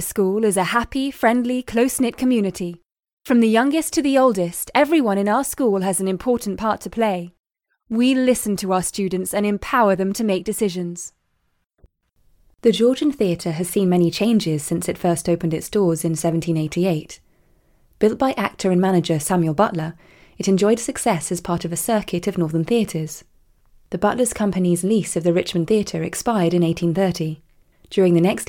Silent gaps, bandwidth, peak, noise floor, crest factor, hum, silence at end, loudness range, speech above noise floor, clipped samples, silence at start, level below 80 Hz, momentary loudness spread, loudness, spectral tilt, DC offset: 2.99-3.03 s, 3.13-3.17 s, 7.39-7.44 s; 18 kHz; -2 dBFS; -68 dBFS; 18 dB; none; 0.05 s; 4 LU; 49 dB; under 0.1%; 0 s; -50 dBFS; 8 LU; -20 LUFS; -5.5 dB/octave; under 0.1%